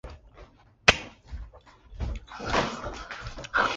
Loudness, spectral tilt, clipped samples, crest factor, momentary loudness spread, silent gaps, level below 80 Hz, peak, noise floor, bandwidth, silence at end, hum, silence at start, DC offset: -28 LUFS; -3 dB/octave; under 0.1%; 30 dB; 23 LU; none; -42 dBFS; -2 dBFS; -53 dBFS; 10 kHz; 0 s; none; 0.05 s; under 0.1%